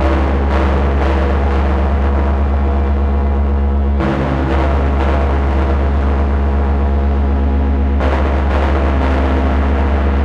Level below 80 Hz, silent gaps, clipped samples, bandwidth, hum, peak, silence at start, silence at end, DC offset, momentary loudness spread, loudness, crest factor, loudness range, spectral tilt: -14 dBFS; none; under 0.1%; 5.4 kHz; none; -2 dBFS; 0 s; 0 s; under 0.1%; 1 LU; -15 LUFS; 10 dB; 0 LU; -9 dB/octave